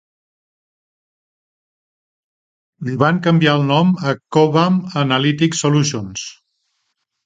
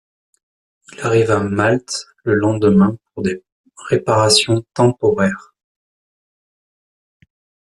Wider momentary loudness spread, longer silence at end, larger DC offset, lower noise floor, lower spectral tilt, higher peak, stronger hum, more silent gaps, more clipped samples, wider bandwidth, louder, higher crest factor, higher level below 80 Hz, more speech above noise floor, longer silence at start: about the same, 12 LU vs 12 LU; second, 0.95 s vs 2.35 s; neither; second, -71 dBFS vs under -90 dBFS; about the same, -5.5 dB/octave vs -5 dB/octave; about the same, 0 dBFS vs 0 dBFS; neither; second, none vs 3.52-3.64 s; neither; second, 9.4 kHz vs 12.5 kHz; about the same, -16 LUFS vs -16 LUFS; about the same, 18 dB vs 18 dB; about the same, -58 dBFS vs -54 dBFS; second, 56 dB vs over 74 dB; first, 2.8 s vs 1 s